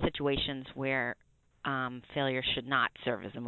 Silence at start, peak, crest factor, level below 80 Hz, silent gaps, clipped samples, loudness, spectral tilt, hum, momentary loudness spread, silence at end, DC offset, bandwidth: 0 s; -14 dBFS; 20 dB; -54 dBFS; none; under 0.1%; -33 LUFS; -7.5 dB/octave; none; 7 LU; 0 s; under 0.1%; 4.3 kHz